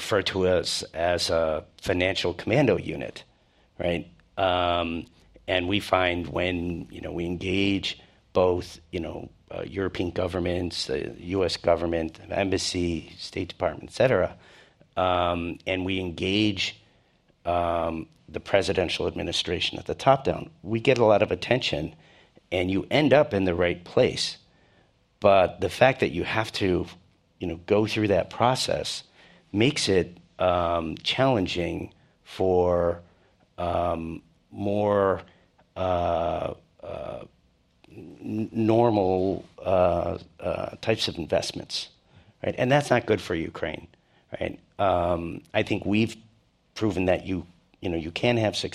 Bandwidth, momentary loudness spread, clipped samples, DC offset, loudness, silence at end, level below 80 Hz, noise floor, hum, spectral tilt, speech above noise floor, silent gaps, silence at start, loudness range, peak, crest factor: 14 kHz; 13 LU; under 0.1%; under 0.1%; -26 LUFS; 0.05 s; -54 dBFS; -63 dBFS; none; -5 dB/octave; 38 dB; none; 0 s; 4 LU; -4 dBFS; 22 dB